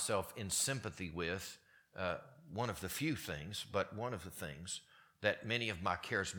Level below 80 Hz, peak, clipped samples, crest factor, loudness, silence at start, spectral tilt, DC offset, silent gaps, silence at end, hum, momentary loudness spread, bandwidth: -64 dBFS; -16 dBFS; under 0.1%; 24 dB; -40 LUFS; 0 s; -3.5 dB/octave; under 0.1%; none; 0 s; none; 11 LU; 19 kHz